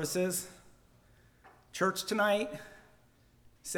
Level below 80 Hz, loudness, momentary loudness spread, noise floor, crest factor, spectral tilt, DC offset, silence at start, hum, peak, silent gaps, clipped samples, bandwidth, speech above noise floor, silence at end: -68 dBFS; -32 LUFS; 18 LU; -65 dBFS; 20 dB; -3.5 dB/octave; under 0.1%; 0 s; none; -16 dBFS; none; under 0.1%; over 20 kHz; 33 dB; 0 s